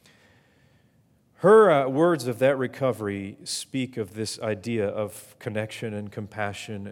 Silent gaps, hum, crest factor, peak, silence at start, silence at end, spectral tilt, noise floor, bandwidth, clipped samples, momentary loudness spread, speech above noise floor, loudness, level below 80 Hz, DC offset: none; none; 20 dB; -6 dBFS; 1.4 s; 0 s; -5.5 dB/octave; -63 dBFS; 16.5 kHz; under 0.1%; 16 LU; 38 dB; -25 LUFS; -74 dBFS; under 0.1%